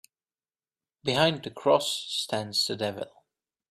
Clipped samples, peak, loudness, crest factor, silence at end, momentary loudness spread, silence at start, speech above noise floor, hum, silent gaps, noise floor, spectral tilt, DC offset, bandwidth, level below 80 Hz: under 0.1%; -8 dBFS; -27 LUFS; 22 dB; 0.6 s; 10 LU; 1.05 s; over 63 dB; none; none; under -90 dBFS; -3.5 dB/octave; under 0.1%; 15.5 kHz; -68 dBFS